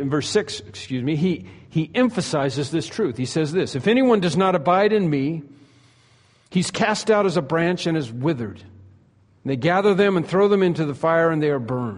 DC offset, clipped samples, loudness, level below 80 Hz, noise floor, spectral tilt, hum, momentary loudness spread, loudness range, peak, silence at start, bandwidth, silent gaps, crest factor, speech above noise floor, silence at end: under 0.1%; under 0.1%; -21 LUFS; -58 dBFS; -56 dBFS; -6 dB/octave; none; 9 LU; 3 LU; -6 dBFS; 0 s; 10.5 kHz; none; 16 dB; 36 dB; 0 s